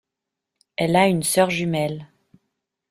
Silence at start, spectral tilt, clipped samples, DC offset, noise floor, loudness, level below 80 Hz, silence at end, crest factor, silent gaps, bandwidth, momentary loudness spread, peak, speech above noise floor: 0.8 s; -4.5 dB/octave; under 0.1%; under 0.1%; -84 dBFS; -20 LUFS; -58 dBFS; 0.85 s; 20 dB; none; 16 kHz; 14 LU; -4 dBFS; 64 dB